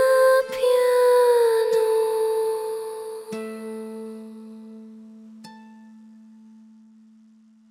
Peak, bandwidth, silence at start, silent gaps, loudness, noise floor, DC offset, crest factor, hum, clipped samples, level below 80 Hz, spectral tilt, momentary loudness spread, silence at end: -8 dBFS; 17 kHz; 0 s; none; -21 LUFS; -54 dBFS; under 0.1%; 14 dB; none; under 0.1%; -72 dBFS; -3 dB/octave; 24 LU; 2 s